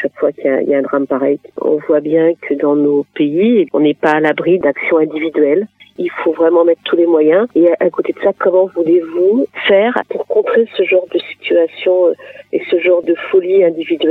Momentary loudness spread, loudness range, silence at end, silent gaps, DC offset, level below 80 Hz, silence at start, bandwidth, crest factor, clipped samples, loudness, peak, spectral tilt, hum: 6 LU; 2 LU; 0 s; none; under 0.1%; -64 dBFS; 0 s; 4.5 kHz; 12 dB; under 0.1%; -13 LUFS; 0 dBFS; -7.5 dB/octave; none